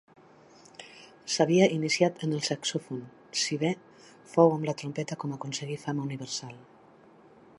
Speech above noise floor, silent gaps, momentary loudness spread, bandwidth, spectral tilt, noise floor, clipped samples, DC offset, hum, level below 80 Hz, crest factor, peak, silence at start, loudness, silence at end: 28 dB; none; 22 LU; 11.5 kHz; -4.5 dB/octave; -56 dBFS; under 0.1%; under 0.1%; none; -76 dBFS; 22 dB; -8 dBFS; 0.8 s; -28 LUFS; 0.95 s